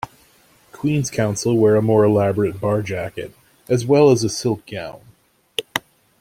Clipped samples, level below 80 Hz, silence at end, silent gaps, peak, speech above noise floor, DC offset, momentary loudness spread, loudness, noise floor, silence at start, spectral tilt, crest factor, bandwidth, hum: under 0.1%; -54 dBFS; 0.4 s; none; -2 dBFS; 36 dB; under 0.1%; 17 LU; -19 LUFS; -54 dBFS; 0.05 s; -6 dB/octave; 18 dB; 16 kHz; none